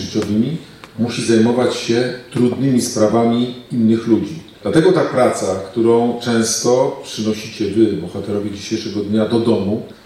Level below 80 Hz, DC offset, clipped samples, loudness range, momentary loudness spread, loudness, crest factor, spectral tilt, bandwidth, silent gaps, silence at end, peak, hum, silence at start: -56 dBFS; under 0.1%; under 0.1%; 3 LU; 9 LU; -17 LUFS; 14 dB; -5.5 dB/octave; 14 kHz; none; 0.1 s; -2 dBFS; none; 0 s